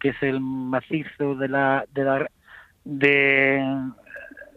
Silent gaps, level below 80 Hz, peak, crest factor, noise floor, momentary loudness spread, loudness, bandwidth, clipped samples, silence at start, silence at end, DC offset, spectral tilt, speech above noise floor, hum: none; -62 dBFS; -6 dBFS; 18 dB; -42 dBFS; 18 LU; -22 LUFS; 5 kHz; under 0.1%; 0 s; 0.1 s; under 0.1%; -8 dB/octave; 19 dB; none